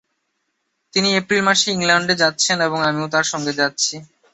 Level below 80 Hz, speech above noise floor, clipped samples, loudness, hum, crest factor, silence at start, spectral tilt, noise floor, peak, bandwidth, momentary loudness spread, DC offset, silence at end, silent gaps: -62 dBFS; 54 dB; under 0.1%; -17 LUFS; none; 18 dB; 0.95 s; -2.5 dB/octave; -72 dBFS; -2 dBFS; 8.4 kHz; 6 LU; under 0.1%; 0.3 s; none